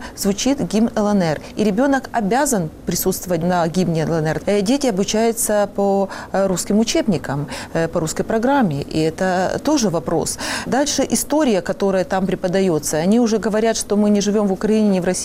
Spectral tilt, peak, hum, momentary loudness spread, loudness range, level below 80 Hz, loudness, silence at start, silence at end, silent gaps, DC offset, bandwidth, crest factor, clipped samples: -5 dB/octave; -6 dBFS; none; 5 LU; 2 LU; -42 dBFS; -18 LUFS; 0 s; 0 s; none; under 0.1%; 16 kHz; 12 dB; under 0.1%